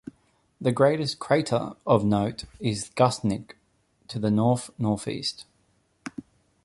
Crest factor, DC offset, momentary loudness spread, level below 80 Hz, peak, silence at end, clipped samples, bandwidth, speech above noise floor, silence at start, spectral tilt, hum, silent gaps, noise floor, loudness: 22 dB; under 0.1%; 18 LU; -56 dBFS; -6 dBFS; 0.45 s; under 0.1%; 11.5 kHz; 43 dB; 0.6 s; -6 dB/octave; none; none; -67 dBFS; -25 LUFS